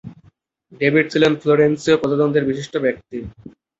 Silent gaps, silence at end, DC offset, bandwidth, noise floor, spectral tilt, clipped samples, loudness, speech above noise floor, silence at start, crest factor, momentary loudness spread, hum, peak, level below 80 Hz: none; 0.3 s; under 0.1%; 8 kHz; -56 dBFS; -6 dB/octave; under 0.1%; -17 LUFS; 38 dB; 0.05 s; 18 dB; 15 LU; none; -2 dBFS; -52 dBFS